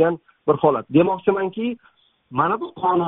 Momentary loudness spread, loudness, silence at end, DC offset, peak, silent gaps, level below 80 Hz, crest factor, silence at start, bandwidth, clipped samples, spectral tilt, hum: 10 LU; -21 LUFS; 0 s; under 0.1%; -2 dBFS; none; -62 dBFS; 18 dB; 0 s; 3.9 kHz; under 0.1%; -6 dB/octave; none